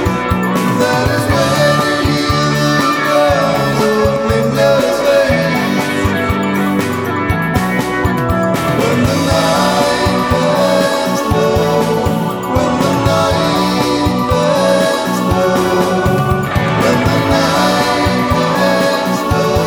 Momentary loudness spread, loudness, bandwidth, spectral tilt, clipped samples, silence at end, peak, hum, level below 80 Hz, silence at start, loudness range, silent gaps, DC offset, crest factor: 3 LU; -13 LUFS; over 20 kHz; -5.5 dB/octave; under 0.1%; 0 s; 0 dBFS; none; -32 dBFS; 0 s; 2 LU; none; under 0.1%; 12 dB